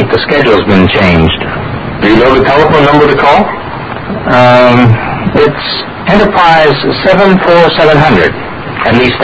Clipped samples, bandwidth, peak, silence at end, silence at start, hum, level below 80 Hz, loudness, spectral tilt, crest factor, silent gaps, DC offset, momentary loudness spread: 3%; 8 kHz; 0 dBFS; 0 s; 0 s; none; -26 dBFS; -7 LUFS; -7 dB/octave; 6 dB; none; under 0.1%; 11 LU